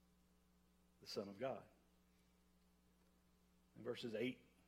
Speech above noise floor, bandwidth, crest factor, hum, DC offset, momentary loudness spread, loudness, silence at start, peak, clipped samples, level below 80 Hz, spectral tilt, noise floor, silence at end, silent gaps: 28 dB; 16 kHz; 22 dB; none; under 0.1%; 9 LU; -49 LUFS; 1 s; -32 dBFS; under 0.1%; -82 dBFS; -5 dB/octave; -76 dBFS; 0.2 s; none